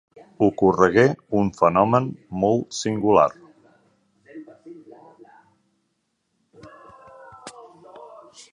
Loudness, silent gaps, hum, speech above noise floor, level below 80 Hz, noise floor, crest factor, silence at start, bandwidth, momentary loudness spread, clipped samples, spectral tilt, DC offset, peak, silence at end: -20 LUFS; none; none; 54 dB; -56 dBFS; -73 dBFS; 22 dB; 0.4 s; 11 kHz; 26 LU; under 0.1%; -6.5 dB/octave; under 0.1%; -2 dBFS; 0.45 s